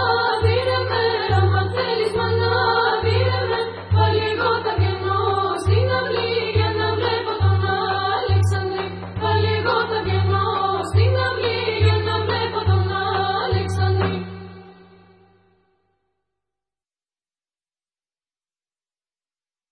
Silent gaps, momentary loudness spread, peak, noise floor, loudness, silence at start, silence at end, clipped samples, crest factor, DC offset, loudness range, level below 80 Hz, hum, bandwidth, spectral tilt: none; 4 LU; -6 dBFS; under -90 dBFS; -20 LUFS; 0 s; 5 s; under 0.1%; 16 dB; under 0.1%; 4 LU; -44 dBFS; none; 10 kHz; -6.5 dB/octave